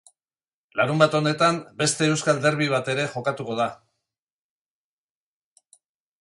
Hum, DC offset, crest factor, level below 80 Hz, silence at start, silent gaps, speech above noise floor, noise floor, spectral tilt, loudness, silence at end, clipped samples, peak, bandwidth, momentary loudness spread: none; under 0.1%; 22 dB; -68 dBFS; 0.75 s; none; over 68 dB; under -90 dBFS; -4.5 dB/octave; -23 LUFS; 2.45 s; under 0.1%; -4 dBFS; 11.5 kHz; 8 LU